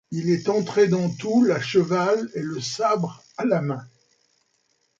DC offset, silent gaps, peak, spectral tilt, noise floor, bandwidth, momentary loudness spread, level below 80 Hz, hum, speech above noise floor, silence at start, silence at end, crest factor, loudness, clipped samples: under 0.1%; none; -6 dBFS; -6 dB/octave; -69 dBFS; 7.8 kHz; 9 LU; -66 dBFS; none; 47 dB; 0.1 s; 1.1 s; 16 dB; -23 LUFS; under 0.1%